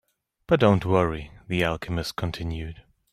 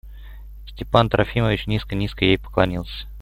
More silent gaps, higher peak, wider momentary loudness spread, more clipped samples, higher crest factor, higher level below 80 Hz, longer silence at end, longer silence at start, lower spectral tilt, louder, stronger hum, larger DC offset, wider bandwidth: neither; second, -6 dBFS vs -2 dBFS; about the same, 14 LU vs 16 LU; neither; about the same, 20 dB vs 20 dB; second, -44 dBFS vs -36 dBFS; first, 0.3 s vs 0 s; first, 0.5 s vs 0.05 s; about the same, -6.5 dB/octave vs -7.5 dB/octave; second, -25 LUFS vs -21 LUFS; second, none vs 50 Hz at -35 dBFS; neither; about the same, 15 kHz vs 15.5 kHz